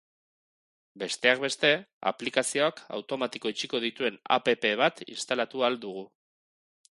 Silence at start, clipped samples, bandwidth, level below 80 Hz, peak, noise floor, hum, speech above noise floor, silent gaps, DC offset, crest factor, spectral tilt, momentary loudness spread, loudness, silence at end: 0.95 s; under 0.1%; 11.5 kHz; -78 dBFS; -6 dBFS; under -90 dBFS; none; over 61 dB; 1.93-2.01 s; under 0.1%; 24 dB; -2.5 dB/octave; 11 LU; -28 LUFS; 0.9 s